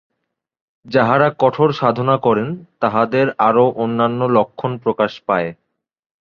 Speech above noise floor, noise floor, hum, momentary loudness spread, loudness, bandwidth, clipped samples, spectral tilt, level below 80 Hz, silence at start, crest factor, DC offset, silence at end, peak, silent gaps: 60 dB; -77 dBFS; none; 7 LU; -17 LUFS; 6.8 kHz; under 0.1%; -8.5 dB/octave; -58 dBFS; 0.85 s; 16 dB; under 0.1%; 0.65 s; -2 dBFS; none